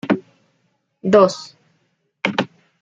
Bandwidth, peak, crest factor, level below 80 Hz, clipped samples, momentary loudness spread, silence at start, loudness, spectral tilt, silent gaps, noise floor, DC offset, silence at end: 7.8 kHz; 0 dBFS; 20 dB; -64 dBFS; under 0.1%; 18 LU; 0.05 s; -18 LUFS; -5.5 dB/octave; none; -67 dBFS; under 0.1%; 0.35 s